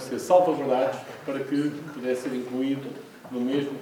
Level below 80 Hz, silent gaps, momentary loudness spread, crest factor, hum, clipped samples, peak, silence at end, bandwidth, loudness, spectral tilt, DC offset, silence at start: -76 dBFS; none; 14 LU; 20 dB; none; under 0.1%; -8 dBFS; 0 s; 19 kHz; -26 LUFS; -6 dB/octave; under 0.1%; 0 s